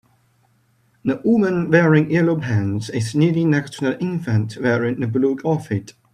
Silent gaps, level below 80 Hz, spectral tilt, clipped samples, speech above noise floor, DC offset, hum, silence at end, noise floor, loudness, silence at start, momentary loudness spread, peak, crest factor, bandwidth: none; -58 dBFS; -7.5 dB/octave; under 0.1%; 42 dB; under 0.1%; none; 0.25 s; -60 dBFS; -19 LUFS; 1.05 s; 8 LU; 0 dBFS; 18 dB; 11 kHz